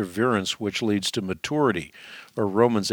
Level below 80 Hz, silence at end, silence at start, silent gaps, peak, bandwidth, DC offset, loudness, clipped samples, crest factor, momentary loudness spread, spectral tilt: -60 dBFS; 0 s; 0 s; none; -4 dBFS; 18.5 kHz; under 0.1%; -24 LUFS; under 0.1%; 20 dB; 12 LU; -4.5 dB/octave